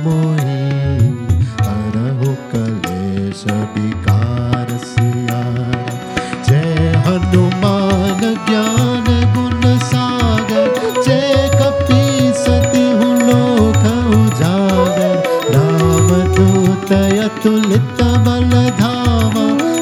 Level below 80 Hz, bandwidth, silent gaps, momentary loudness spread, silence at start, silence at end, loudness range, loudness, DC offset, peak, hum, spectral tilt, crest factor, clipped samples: -32 dBFS; 15.5 kHz; none; 7 LU; 0 s; 0 s; 5 LU; -14 LUFS; under 0.1%; 0 dBFS; none; -6.5 dB/octave; 12 dB; under 0.1%